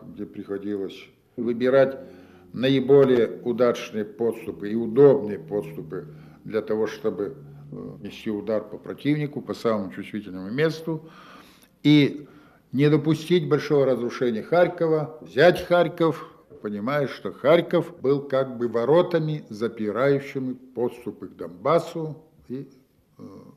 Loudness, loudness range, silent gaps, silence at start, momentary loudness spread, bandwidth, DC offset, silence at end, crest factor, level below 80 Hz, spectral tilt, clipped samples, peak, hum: -23 LUFS; 8 LU; none; 0.05 s; 18 LU; 14.5 kHz; under 0.1%; 0.15 s; 20 dB; -64 dBFS; -7.5 dB/octave; under 0.1%; -4 dBFS; none